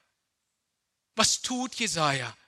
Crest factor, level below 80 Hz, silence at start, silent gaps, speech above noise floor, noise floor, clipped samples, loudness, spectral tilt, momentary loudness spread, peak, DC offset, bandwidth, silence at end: 24 dB; -64 dBFS; 1.15 s; none; 53 dB; -82 dBFS; under 0.1%; -26 LUFS; -2 dB/octave; 7 LU; -6 dBFS; under 0.1%; 14.5 kHz; 0.15 s